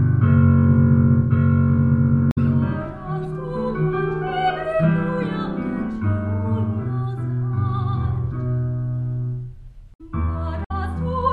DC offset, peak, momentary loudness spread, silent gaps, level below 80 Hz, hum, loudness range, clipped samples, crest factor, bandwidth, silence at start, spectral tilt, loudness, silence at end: under 0.1%; -4 dBFS; 11 LU; 2.32-2.36 s, 9.95-9.99 s, 10.66-10.70 s; -36 dBFS; none; 7 LU; under 0.1%; 16 dB; 4.7 kHz; 0 s; -10.5 dB/octave; -21 LUFS; 0 s